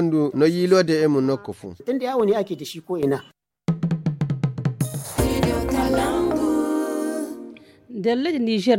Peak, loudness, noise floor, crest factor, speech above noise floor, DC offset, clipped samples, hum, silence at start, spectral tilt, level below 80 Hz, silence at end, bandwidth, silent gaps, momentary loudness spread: -4 dBFS; -22 LUFS; -42 dBFS; 18 dB; 22 dB; under 0.1%; under 0.1%; none; 0 s; -6.5 dB/octave; -40 dBFS; 0 s; 17 kHz; none; 11 LU